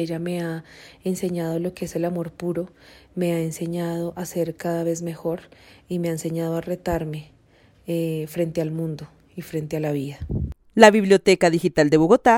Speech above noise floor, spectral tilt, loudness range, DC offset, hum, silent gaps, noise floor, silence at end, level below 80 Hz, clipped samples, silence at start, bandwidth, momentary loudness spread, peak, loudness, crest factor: 33 dB; -6 dB/octave; 9 LU; under 0.1%; none; none; -55 dBFS; 0 s; -46 dBFS; under 0.1%; 0 s; 16.5 kHz; 15 LU; 0 dBFS; -23 LUFS; 22 dB